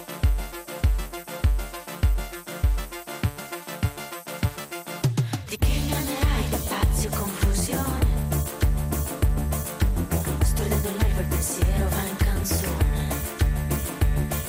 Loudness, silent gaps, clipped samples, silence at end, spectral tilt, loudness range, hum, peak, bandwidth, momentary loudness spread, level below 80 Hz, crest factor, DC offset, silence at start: -26 LUFS; none; under 0.1%; 0 s; -5 dB/octave; 4 LU; none; -12 dBFS; 16 kHz; 7 LU; -28 dBFS; 14 dB; under 0.1%; 0 s